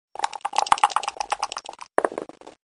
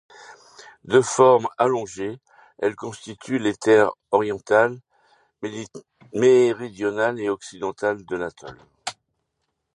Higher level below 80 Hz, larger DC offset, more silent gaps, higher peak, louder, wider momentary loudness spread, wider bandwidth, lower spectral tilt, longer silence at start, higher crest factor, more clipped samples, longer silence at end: about the same, -66 dBFS vs -64 dBFS; neither; neither; about the same, 0 dBFS vs -2 dBFS; second, -25 LUFS vs -21 LUFS; second, 14 LU vs 19 LU; about the same, 11 kHz vs 11 kHz; second, -0.5 dB/octave vs -5 dB/octave; about the same, 0.2 s vs 0.3 s; about the same, 26 dB vs 22 dB; neither; second, 0.15 s vs 0.85 s